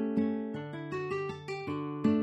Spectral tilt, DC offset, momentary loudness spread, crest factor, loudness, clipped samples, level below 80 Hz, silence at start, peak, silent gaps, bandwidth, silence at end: -8 dB/octave; under 0.1%; 8 LU; 16 dB; -35 LUFS; under 0.1%; -70 dBFS; 0 s; -16 dBFS; none; 8.4 kHz; 0 s